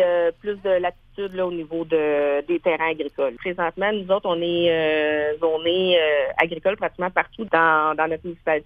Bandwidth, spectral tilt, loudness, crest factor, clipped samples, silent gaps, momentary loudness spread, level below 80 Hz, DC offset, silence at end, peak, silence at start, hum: 4.9 kHz; -7 dB/octave; -22 LUFS; 20 dB; under 0.1%; none; 8 LU; -54 dBFS; under 0.1%; 0.05 s; -2 dBFS; 0 s; none